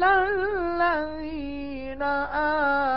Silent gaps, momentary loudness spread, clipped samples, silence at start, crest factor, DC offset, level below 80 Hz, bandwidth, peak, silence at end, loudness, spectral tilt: none; 11 LU; under 0.1%; 0 s; 16 dB; 0.7%; -46 dBFS; 5.8 kHz; -10 dBFS; 0 s; -26 LUFS; -9 dB/octave